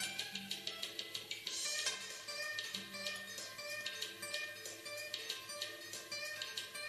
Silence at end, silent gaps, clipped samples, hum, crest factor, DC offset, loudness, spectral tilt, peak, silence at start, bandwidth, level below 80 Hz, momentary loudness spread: 0 s; none; under 0.1%; none; 24 dB; under 0.1%; -42 LUFS; 0 dB/octave; -22 dBFS; 0 s; 14 kHz; -86 dBFS; 6 LU